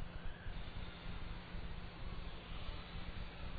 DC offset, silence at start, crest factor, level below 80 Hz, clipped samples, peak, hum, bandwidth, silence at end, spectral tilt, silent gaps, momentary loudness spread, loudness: 0.1%; 0 s; 14 dB; -48 dBFS; under 0.1%; -32 dBFS; none; 4.9 kHz; 0 s; -4 dB/octave; none; 1 LU; -50 LUFS